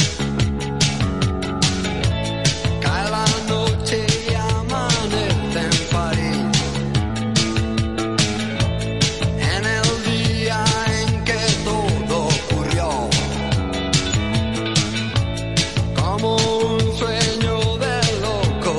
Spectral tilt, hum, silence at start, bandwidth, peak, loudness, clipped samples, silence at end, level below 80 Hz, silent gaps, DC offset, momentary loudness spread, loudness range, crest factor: -4.5 dB/octave; none; 0 s; 11.5 kHz; -4 dBFS; -20 LUFS; under 0.1%; 0 s; -32 dBFS; none; 0.8%; 3 LU; 1 LU; 16 dB